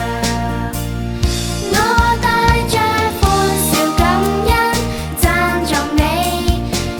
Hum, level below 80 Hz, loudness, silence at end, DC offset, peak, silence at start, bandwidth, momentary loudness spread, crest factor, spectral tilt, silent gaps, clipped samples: none; -22 dBFS; -15 LUFS; 0 s; under 0.1%; 0 dBFS; 0 s; over 20 kHz; 6 LU; 16 dB; -4.5 dB/octave; none; under 0.1%